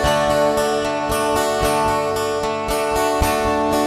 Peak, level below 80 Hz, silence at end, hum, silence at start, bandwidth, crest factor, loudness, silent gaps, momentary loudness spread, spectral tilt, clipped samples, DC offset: -2 dBFS; -34 dBFS; 0 s; none; 0 s; 14 kHz; 16 dB; -19 LUFS; none; 4 LU; -4 dB/octave; under 0.1%; under 0.1%